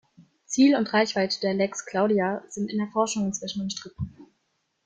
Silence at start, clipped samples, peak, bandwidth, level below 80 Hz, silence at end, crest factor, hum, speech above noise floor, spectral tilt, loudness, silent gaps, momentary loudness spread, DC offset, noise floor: 0.2 s; under 0.1%; -8 dBFS; 9.4 kHz; -60 dBFS; 0.6 s; 18 dB; none; 50 dB; -4.5 dB/octave; -25 LUFS; none; 13 LU; under 0.1%; -74 dBFS